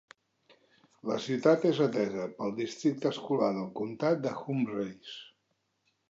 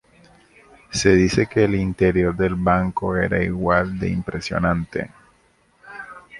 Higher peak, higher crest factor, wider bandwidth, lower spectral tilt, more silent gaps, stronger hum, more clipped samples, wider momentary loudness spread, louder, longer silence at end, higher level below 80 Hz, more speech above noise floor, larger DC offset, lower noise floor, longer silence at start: second, -10 dBFS vs 0 dBFS; about the same, 20 dB vs 20 dB; second, 8 kHz vs 11.5 kHz; about the same, -6.5 dB/octave vs -6 dB/octave; neither; neither; neither; about the same, 12 LU vs 14 LU; second, -31 LUFS vs -20 LUFS; first, 0.85 s vs 0 s; second, -78 dBFS vs -38 dBFS; first, 48 dB vs 40 dB; neither; first, -78 dBFS vs -59 dBFS; first, 1.05 s vs 0.9 s